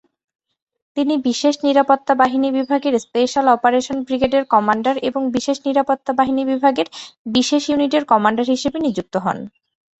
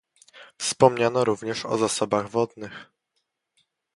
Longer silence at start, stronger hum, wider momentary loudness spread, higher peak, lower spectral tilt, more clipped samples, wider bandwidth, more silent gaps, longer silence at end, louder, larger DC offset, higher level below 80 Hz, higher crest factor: first, 0.95 s vs 0.35 s; neither; second, 7 LU vs 16 LU; about the same, -2 dBFS vs -2 dBFS; about the same, -4 dB/octave vs -4 dB/octave; neither; second, 8.2 kHz vs 11.5 kHz; first, 7.18-7.25 s vs none; second, 0.5 s vs 1.1 s; first, -18 LUFS vs -24 LUFS; neither; first, -56 dBFS vs -64 dBFS; second, 16 dB vs 24 dB